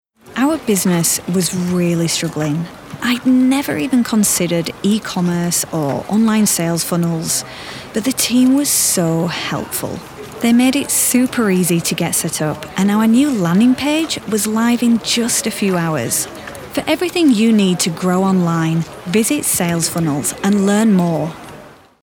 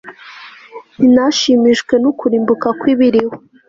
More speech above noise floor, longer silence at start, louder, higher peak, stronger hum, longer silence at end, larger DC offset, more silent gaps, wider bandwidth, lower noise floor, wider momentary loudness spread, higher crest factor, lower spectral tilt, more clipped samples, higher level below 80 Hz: about the same, 24 dB vs 24 dB; first, 0.25 s vs 0.05 s; about the same, -15 LUFS vs -13 LUFS; about the same, -2 dBFS vs -2 dBFS; neither; about the same, 0.3 s vs 0.3 s; neither; neither; first, 19.5 kHz vs 7.6 kHz; about the same, -39 dBFS vs -36 dBFS; second, 8 LU vs 23 LU; about the same, 14 dB vs 12 dB; about the same, -4 dB/octave vs -4.5 dB/octave; neither; about the same, -52 dBFS vs -54 dBFS